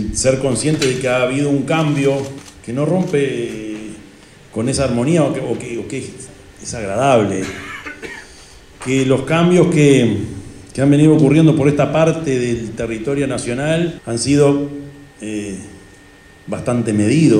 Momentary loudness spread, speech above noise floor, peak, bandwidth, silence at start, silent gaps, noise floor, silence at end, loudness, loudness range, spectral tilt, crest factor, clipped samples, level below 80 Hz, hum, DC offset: 18 LU; 28 dB; -2 dBFS; 12 kHz; 0 s; none; -43 dBFS; 0 s; -16 LUFS; 7 LU; -6 dB/octave; 16 dB; under 0.1%; -44 dBFS; none; under 0.1%